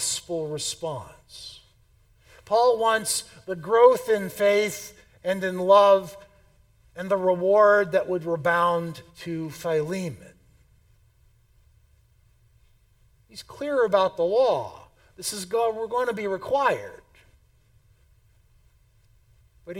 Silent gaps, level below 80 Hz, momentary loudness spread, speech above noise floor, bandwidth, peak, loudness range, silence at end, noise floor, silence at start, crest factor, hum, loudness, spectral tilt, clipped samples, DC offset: none; -62 dBFS; 21 LU; 37 dB; 17.5 kHz; -4 dBFS; 12 LU; 0 s; -60 dBFS; 0 s; 22 dB; none; -23 LUFS; -3.5 dB/octave; under 0.1%; under 0.1%